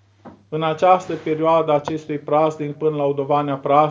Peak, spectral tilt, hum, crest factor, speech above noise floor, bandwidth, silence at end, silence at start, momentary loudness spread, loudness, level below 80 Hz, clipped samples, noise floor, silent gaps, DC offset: -2 dBFS; -7 dB/octave; none; 18 dB; 27 dB; 7.6 kHz; 0 s; 0.25 s; 8 LU; -19 LUFS; -62 dBFS; under 0.1%; -45 dBFS; none; under 0.1%